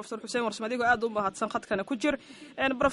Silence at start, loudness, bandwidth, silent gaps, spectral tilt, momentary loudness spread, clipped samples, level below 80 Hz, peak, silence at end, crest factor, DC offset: 0 s; -29 LUFS; 11.5 kHz; none; -4 dB/octave; 7 LU; under 0.1%; -58 dBFS; -12 dBFS; 0 s; 18 dB; under 0.1%